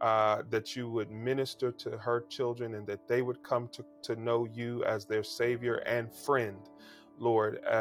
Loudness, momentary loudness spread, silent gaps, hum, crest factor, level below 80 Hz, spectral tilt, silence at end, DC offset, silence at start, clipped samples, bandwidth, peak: -33 LUFS; 9 LU; none; none; 18 dB; -76 dBFS; -6 dB/octave; 0 s; under 0.1%; 0 s; under 0.1%; 17.5 kHz; -14 dBFS